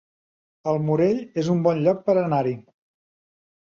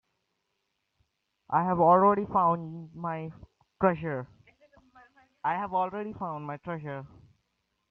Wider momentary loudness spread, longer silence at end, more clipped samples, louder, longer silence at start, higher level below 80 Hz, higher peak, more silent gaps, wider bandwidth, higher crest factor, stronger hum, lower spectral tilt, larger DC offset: second, 8 LU vs 17 LU; first, 1.05 s vs 0.85 s; neither; first, -22 LUFS vs -28 LUFS; second, 0.65 s vs 1.5 s; about the same, -64 dBFS vs -66 dBFS; first, -6 dBFS vs -10 dBFS; neither; first, 7.4 kHz vs 4.8 kHz; about the same, 18 dB vs 20 dB; neither; second, -8.5 dB/octave vs -10.5 dB/octave; neither